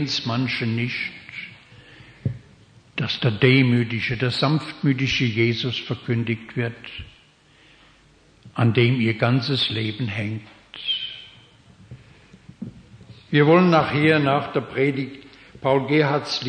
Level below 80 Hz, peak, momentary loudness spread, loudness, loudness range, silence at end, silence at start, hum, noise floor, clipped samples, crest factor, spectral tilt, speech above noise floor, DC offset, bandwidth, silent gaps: -54 dBFS; -2 dBFS; 18 LU; -21 LUFS; 7 LU; 0 s; 0 s; none; -55 dBFS; under 0.1%; 20 dB; -6.5 dB/octave; 34 dB; under 0.1%; 9.4 kHz; none